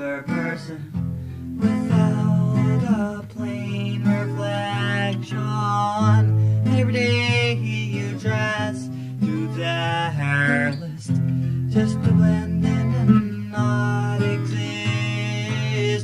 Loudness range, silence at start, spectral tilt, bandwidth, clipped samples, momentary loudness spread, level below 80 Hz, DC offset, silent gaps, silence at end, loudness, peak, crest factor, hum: 3 LU; 0 s; -7 dB/octave; 11 kHz; under 0.1%; 9 LU; -52 dBFS; under 0.1%; none; 0 s; -22 LUFS; -2 dBFS; 18 dB; none